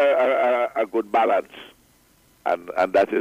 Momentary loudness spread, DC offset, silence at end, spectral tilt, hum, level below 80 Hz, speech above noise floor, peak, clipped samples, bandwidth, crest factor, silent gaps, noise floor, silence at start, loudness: 10 LU; under 0.1%; 0 s; -5 dB/octave; none; -66 dBFS; 36 dB; -10 dBFS; under 0.1%; 15.5 kHz; 12 dB; none; -58 dBFS; 0 s; -22 LUFS